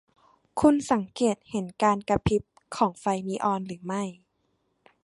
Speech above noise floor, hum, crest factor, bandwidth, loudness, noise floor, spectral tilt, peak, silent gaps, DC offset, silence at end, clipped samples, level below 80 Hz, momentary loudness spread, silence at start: 47 dB; none; 20 dB; 11.5 kHz; -27 LUFS; -73 dBFS; -6 dB/octave; -6 dBFS; none; under 0.1%; 0.9 s; under 0.1%; -50 dBFS; 11 LU; 0.55 s